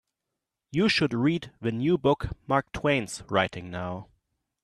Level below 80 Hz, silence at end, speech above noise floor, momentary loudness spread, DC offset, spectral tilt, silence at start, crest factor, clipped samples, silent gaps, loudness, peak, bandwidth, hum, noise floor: -50 dBFS; 0.6 s; 59 dB; 11 LU; under 0.1%; -5.5 dB/octave; 0.75 s; 20 dB; under 0.1%; none; -27 LUFS; -8 dBFS; 13 kHz; none; -85 dBFS